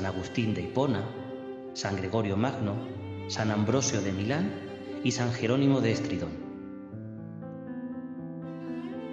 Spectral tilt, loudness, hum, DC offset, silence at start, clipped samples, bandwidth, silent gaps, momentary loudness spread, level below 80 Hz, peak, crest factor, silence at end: -5.5 dB/octave; -31 LUFS; none; under 0.1%; 0 s; under 0.1%; 8.4 kHz; none; 14 LU; -64 dBFS; -12 dBFS; 18 dB; 0 s